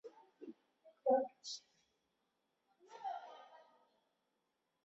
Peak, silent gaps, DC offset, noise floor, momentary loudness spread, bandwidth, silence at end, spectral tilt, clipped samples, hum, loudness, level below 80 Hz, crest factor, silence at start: -22 dBFS; none; under 0.1%; -86 dBFS; 24 LU; 7.6 kHz; 1.25 s; -1.5 dB/octave; under 0.1%; none; -41 LUFS; under -90 dBFS; 24 dB; 0.05 s